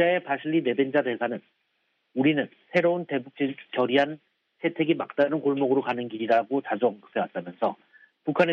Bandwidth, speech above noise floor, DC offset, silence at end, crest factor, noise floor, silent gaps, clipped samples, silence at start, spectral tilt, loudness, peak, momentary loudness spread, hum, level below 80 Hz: 6.8 kHz; 48 dB; under 0.1%; 0 s; 18 dB; -74 dBFS; none; under 0.1%; 0 s; -7.5 dB/octave; -26 LUFS; -8 dBFS; 8 LU; none; -78 dBFS